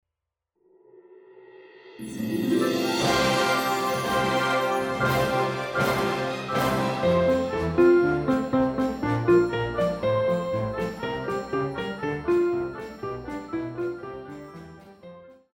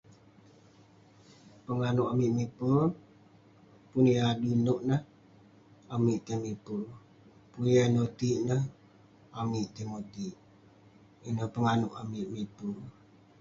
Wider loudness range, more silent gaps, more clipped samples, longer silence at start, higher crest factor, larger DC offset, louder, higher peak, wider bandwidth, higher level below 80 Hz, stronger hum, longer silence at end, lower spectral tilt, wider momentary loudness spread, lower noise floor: about the same, 7 LU vs 6 LU; neither; neither; second, 0.95 s vs 1.7 s; about the same, 18 dB vs 18 dB; neither; first, -25 LUFS vs -31 LUFS; first, -8 dBFS vs -14 dBFS; first, 19.5 kHz vs 7.6 kHz; first, -50 dBFS vs -64 dBFS; neither; second, 0.2 s vs 0.5 s; second, -5.5 dB/octave vs -7 dB/octave; second, 13 LU vs 16 LU; first, -85 dBFS vs -59 dBFS